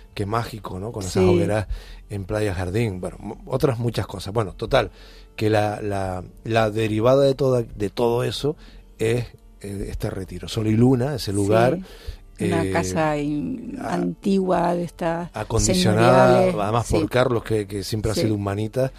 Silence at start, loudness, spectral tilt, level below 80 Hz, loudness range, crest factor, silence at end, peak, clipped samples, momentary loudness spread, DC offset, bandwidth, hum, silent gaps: 0 s; -22 LUFS; -6 dB/octave; -40 dBFS; 5 LU; 18 dB; 0 s; -2 dBFS; under 0.1%; 14 LU; under 0.1%; 15.5 kHz; none; none